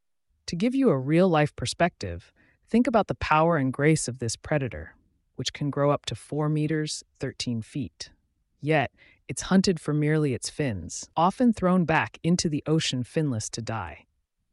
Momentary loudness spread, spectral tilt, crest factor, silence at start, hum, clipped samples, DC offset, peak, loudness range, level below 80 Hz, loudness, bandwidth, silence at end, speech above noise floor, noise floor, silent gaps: 13 LU; -5.5 dB/octave; 16 dB; 0.45 s; none; under 0.1%; under 0.1%; -10 dBFS; 5 LU; -52 dBFS; -26 LUFS; 11.5 kHz; 0.55 s; 20 dB; -45 dBFS; none